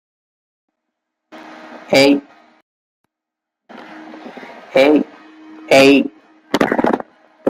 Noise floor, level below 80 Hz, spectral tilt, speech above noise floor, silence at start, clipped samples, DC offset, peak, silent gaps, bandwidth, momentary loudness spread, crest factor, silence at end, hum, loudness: -83 dBFS; -58 dBFS; -4.5 dB/octave; 72 dB; 1.35 s; under 0.1%; under 0.1%; 0 dBFS; 2.62-3.04 s; 16 kHz; 25 LU; 18 dB; 0 s; none; -14 LUFS